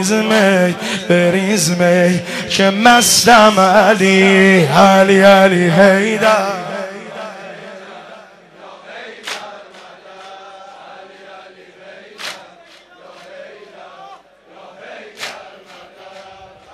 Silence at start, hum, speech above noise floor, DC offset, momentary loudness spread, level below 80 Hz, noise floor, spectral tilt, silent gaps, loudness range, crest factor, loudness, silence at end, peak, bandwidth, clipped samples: 0 s; none; 33 dB; under 0.1%; 25 LU; -52 dBFS; -43 dBFS; -4 dB/octave; none; 25 LU; 14 dB; -10 LUFS; 0.55 s; 0 dBFS; 14.5 kHz; under 0.1%